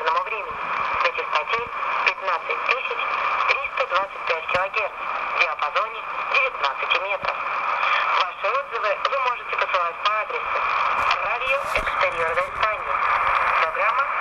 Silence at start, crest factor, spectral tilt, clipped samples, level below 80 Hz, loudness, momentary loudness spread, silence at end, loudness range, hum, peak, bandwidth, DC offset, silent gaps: 0 s; 20 dB; -2 dB/octave; under 0.1%; -52 dBFS; -22 LUFS; 5 LU; 0 s; 2 LU; none; -4 dBFS; 13 kHz; under 0.1%; none